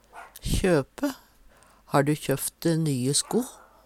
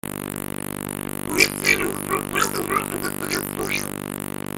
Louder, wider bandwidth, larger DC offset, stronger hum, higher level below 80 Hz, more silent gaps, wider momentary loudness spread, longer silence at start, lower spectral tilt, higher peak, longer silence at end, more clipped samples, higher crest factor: second, -26 LUFS vs -23 LUFS; about the same, 16.5 kHz vs 17 kHz; neither; second, none vs 50 Hz at -50 dBFS; first, -42 dBFS vs -50 dBFS; neither; first, 14 LU vs 11 LU; about the same, 0.15 s vs 0.05 s; first, -4.5 dB/octave vs -3 dB/octave; second, -8 dBFS vs 0 dBFS; first, 0.3 s vs 0 s; neither; about the same, 20 dB vs 24 dB